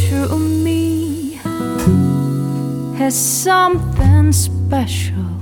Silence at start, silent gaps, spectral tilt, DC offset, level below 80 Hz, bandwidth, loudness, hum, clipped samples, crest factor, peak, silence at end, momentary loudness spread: 0 s; none; -5.5 dB/octave; under 0.1%; -30 dBFS; 19 kHz; -16 LUFS; none; under 0.1%; 14 dB; -2 dBFS; 0 s; 9 LU